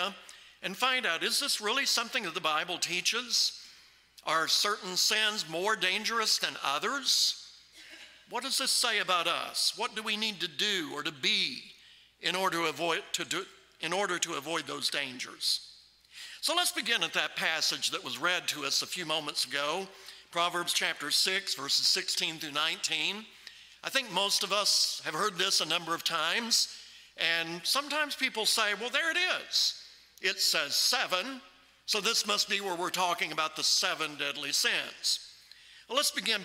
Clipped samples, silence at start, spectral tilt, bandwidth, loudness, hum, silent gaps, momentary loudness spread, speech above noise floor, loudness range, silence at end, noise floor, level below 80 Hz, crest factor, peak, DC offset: under 0.1%; 0 s; -0.5 dB/octave; 16 kHz; -29 LUFS; none; none; 10 LU; 27 dB; 3 LU; 0 s; -58 dBFS; -78 dBFS; 22 dB; -10 dBFS; under 0.1%